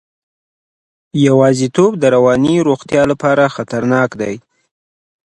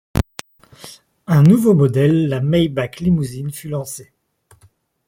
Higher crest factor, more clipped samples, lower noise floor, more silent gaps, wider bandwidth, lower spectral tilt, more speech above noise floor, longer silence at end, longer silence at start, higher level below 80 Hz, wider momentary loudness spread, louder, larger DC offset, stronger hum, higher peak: about the same, 14 dB vs 16 dB; neither; first, under -90 dBFS vs -55 dBFS; neither; second, 11.5 kHz vs 16.5 kHz; about the same, -6.5 dB/octave vs -7.5 dB/octave; first, over 78 dB vs 40 dB; second, 0.85 s vs 1.05 s; first, 1.15 s vs 0.15 s; second, -50 dBFS vs -40 dBFS; second, 10 LU vs 23 LU; first, -13 LUFS vs -16 LUFS; neither; neither; about the same, 0 dBFS vs -2 dBFS